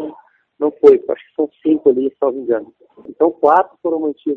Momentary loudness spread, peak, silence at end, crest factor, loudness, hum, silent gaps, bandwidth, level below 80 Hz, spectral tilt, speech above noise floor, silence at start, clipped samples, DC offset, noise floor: 11 LU; 0 dBFS; 0 s; 16 dB; -16 LUFS; none; none; 4.6 kHz; -62 dBFS; -8 dB/octave; 30 dB; 0 s; under 0.1%; under 0.1%; -45 dBFS